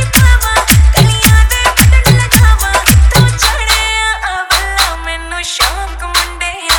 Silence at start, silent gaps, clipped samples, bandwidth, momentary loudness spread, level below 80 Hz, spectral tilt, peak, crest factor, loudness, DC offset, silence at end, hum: 0 s; none; 0.6%; over 20 kHz; 9 LU; -14 dBFS; -3.5 dB/octave; 0 dBFS; 10 dB; -9 LUFS; under 0.1%; 0 s; none